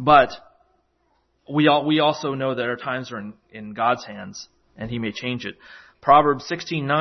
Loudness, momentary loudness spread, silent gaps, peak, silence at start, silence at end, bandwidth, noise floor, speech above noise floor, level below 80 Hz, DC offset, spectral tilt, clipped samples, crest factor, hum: -21 LUFS; 20 LU; none; -2 dBFS; 0 s; 0 s; 6.4 kHz; -67 dBFS; 46 dB; -54 dBFS; under 0.1%; -5.5 dB/octave; under 0.1%; 20 dB; none